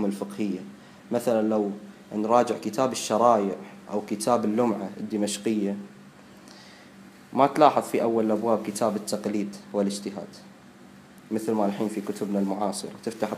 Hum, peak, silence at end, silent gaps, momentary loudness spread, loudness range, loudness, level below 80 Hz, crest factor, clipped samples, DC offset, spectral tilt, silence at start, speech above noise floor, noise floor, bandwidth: none; -2 dBFS; 0 s; none; 15 LU; 5 LU; -26 LUFS; -72 dBFS; 24 dB; under 0.1%; under 0.1%; -5.5 dB/octave; 0 s; 24 dB; -49 dBFS; 15.5 kHz